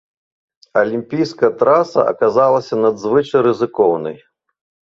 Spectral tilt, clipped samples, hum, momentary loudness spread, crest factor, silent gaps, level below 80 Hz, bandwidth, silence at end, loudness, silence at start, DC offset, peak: -7 dB/octave; under 0.1%; none; 7 LU; 14 dB; none; -60 dBFS; 7.4 kHz; 0.8 s; -15 LUFS; 0.75 s; under 0.1%; -2 dBFS